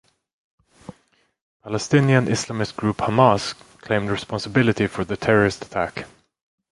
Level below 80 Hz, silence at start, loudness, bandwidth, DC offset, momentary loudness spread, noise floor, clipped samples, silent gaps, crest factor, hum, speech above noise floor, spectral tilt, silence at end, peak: -50 dBFS; 0.9 s; -21 LUFS; 11.5 kHz; under 0.1%; 12 LU; -63 dBFS; under 0.1%; 1.41-1.60 s; 22 dB; none; 43 dB; -6 dB/octave; 0.65 s; -2 dBFS